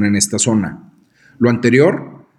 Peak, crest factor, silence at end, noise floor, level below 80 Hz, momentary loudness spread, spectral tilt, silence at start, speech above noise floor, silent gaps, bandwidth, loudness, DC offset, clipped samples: 0 dBFS; 16 dB; 0.25 s; -50 dBFS; -54 dBFS; 10 LU; -4.5 dB/octave; 0 s; 36 dB; none; 13.5 kHz; -15 LUFS; under 0.1%; under 0.1%